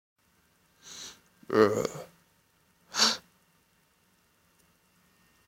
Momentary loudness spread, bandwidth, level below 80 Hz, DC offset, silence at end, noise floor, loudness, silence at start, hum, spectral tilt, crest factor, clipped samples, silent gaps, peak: 21 LU; 16.5 kHz; -70 dBFS; under 0.1%; 2.3 s; -68 dBFS; -27 LUFS; 0.85 s; none; -2.5 dB/octave; 26 dB; under 0.1%; none; -8 dBFS